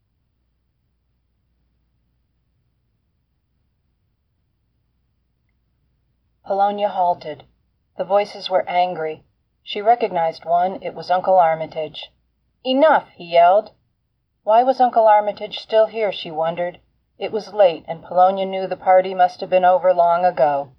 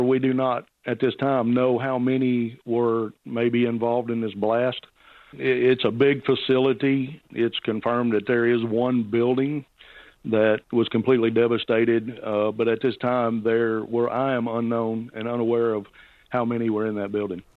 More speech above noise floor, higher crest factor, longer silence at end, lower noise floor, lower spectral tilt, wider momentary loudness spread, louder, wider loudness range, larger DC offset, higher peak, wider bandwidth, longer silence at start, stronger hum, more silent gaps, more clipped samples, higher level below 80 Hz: first, 52 dB vs 27 dB; about the same, 16 dB vs 16 dB; about the same, 0.15 s vs 0.2 s; first, -70 dBFS vs -49 dBFS; second, -6 dB/octave vs -9 dB/octave; first, 15 LU vs 7 LU; first, -18 LUFS vs -23 LUFS; first, 8 LU vs 3 LU; neither; about the same, -4 dBFS vs -6 dBFS; first, 6.2 kHz vs 4.5 kHz; first, 6.45 s vs 0 s; neither; neither; neither; about the same, -68 dBFS vs -64 dBFS